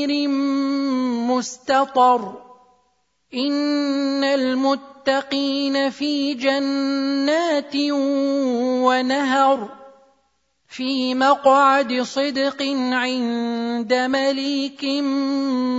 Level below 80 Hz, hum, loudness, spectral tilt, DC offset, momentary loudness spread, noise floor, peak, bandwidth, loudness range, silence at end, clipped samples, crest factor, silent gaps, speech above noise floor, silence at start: -70 dBFS; none; -20 LUFS; -3 dB/octave; under 0.1%; 7 LU; -67 dBFS; -4 dBFS; 7.8 kHz; 2 LU; 0 s; under 0.1%; 16 dB; none; 48 dB; 0 s